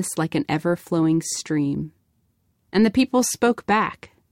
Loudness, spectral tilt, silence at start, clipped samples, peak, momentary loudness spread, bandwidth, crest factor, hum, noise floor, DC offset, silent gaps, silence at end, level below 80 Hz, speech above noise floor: -22 LUFS; -5 dB/octave; 0 s; under 0.1%; -8 dBFS; 7 LU; 16.5 kHz; 14 dB; none; -67 dBFS; under 0.1%; none; 0.25 s; -56 dBFS; 46 dB